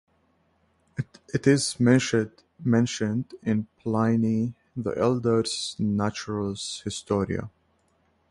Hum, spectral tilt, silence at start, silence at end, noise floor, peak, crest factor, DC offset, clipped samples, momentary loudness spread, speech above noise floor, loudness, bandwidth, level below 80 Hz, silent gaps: none; -5.5 dB/octave; 1 s; 0.8 s; -67 dBFS; -6 dBFS; 20 dB; under 0.1%; under 0.1%; 11 LU; 43 dB; -26 LUFS; 11.5 kHz; -56 dBFS; none